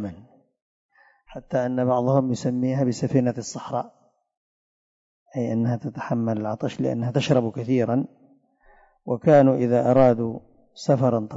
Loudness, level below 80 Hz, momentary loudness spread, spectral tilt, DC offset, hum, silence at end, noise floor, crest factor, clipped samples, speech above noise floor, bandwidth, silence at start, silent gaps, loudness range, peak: -23 LUFS; -58 dBFS; 14 LU; -7.5 dB/octave; under 0.1%; none; 0 s; -57 dBFS; 18 dB; under 0.1%; 35 dB; 7.8 kHz; 0 s; 0.62-0.89 s, 4.37-5.26 s; 7 LU; -6 dBFS